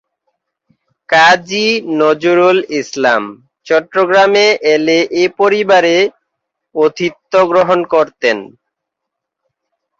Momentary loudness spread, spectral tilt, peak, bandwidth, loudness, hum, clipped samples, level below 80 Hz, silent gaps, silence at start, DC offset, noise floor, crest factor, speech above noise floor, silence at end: 7 LU; -4 dB/octave; 0 dBFS; 7.8 kHz; -12 LUFS; none; under 0.1%; -60 dBFS; none; 1.1 s; under 0.1%; -78 dBFS; 14 dB; 67 dB; 1.5 s